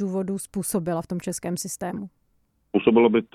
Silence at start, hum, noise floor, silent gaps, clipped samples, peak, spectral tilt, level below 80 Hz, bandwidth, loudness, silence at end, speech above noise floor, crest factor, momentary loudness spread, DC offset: 0 s; none; -67 dBFS; none; under 0.1%; -4 dBFS; -5.5 dB/octave; -58 dBFS; 15.5 kHz; -25 LUFS; 0.1 s; 44 dB; 20 dB; 13 LU; under 0.1%